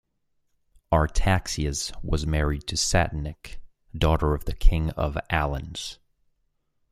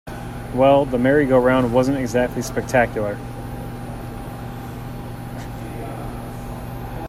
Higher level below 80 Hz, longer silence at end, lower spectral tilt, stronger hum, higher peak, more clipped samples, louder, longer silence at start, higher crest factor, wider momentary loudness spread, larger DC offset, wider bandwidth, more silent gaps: first, -30 dBFS vs -38 dBFS; first, 1 s vs 0 s; second, -4.5 dB/octave vs -6.5 dB/octave; neither; about the same, -4 dBFS vs -2 dBFS; neither; second, -26 LUFS vs -20 LUFS; first, 0.9 s vs 0.05 s; about the same, 20 dB vs 18 dB; second, 12 LU vs 17 LU; neither; about the same, 14.5 kHz vs 15.5 kHz; neither